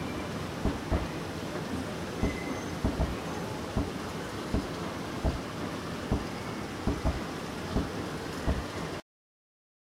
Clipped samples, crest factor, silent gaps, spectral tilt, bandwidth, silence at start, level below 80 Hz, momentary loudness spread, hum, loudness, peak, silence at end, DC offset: under 0.1%; 18 dB; none; -5.5 dB/octave; 16 kHz; 0 s; -40 dBFS; 4 LU; none; -34 LUFS; -16 dBFS; 0.95 s; under 0.1%